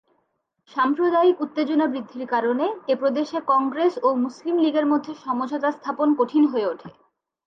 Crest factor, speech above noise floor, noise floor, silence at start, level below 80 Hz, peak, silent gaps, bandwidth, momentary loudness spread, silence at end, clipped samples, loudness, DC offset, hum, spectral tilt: 14 dB; 51 dB; -72 dBFS; 0.75 s; -78 dBFS; -8 dBFS; none; 7.2 kHz; 7 LU; 0.55 s; under 0.1%; -22 LUFS; under 0.1%; none; -6 dB/octave